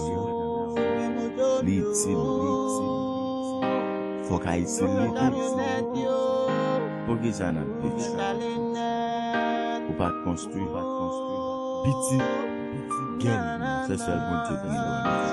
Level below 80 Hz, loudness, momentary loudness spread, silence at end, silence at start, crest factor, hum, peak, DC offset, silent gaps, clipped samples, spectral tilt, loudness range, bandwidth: -52 dBFS; -27 LUFS; 5 LU; 0 s; 0 s; 16 dB; none; -10 dBFS; under 0.1%; none; under 0.1%; -5.5 dB/octave; 2 LU; 12.5 kHz